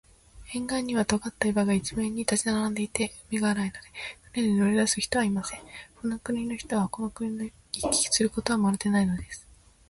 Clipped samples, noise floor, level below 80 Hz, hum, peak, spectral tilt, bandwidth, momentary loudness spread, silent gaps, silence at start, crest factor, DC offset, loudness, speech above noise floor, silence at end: under 0.1%; -47 dBFS; -52 dBFS; none; -6 dBFS; -4 dB/octave; 11.5 kHz; 12 LU; none; 0.35 s; 22 dB; under 0.1%; -27 LUFS; 20 dB; 0.5 s